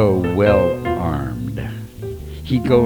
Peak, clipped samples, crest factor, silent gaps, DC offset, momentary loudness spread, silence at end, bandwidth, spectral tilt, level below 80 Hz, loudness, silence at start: -2 dBFS; under 0.1%; 16 dB; none; under 0.1%; 16 LU; 0 s; over 20 kHz; -8 dB/octave; -34 dBFS; -19 LUFS; 0 s